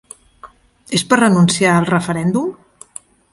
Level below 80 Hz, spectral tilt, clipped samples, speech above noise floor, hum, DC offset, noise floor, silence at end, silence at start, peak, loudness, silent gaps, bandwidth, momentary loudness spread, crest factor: -52 dBFS; -5 dB/octave; under 0.1%; 29 dB; none; under 0.1%; -43 dBFS; 0.8 s; 0.45 s; 0 dBFS; -15 LUFS; none; 11.5 kHz; 23 LU; 16 dB